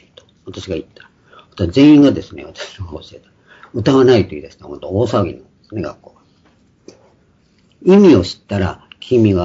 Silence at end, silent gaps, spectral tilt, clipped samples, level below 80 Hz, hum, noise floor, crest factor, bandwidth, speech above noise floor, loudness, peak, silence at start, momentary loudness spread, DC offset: 0 s; none; -7.5 dB/octave; under 0.1%; -46 dBFS; none; -54 dBFS; 16 dB; 7.8 kHz; 41 dB; -14 LUFS; 0 dBFS; 0.45 s; 23 LU; under 0.1%